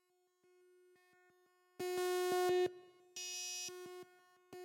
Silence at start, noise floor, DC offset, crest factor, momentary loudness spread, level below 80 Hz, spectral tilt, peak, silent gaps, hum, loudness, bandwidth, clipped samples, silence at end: 1.8 s; -77 dBFS; under 0.1%; 14 dB; 22 LU; -88 dBFS; -2 dB/octave; -28 dBFS; none; none; -39 LUFS; 16.5 kHz; under 0.1%; 0 s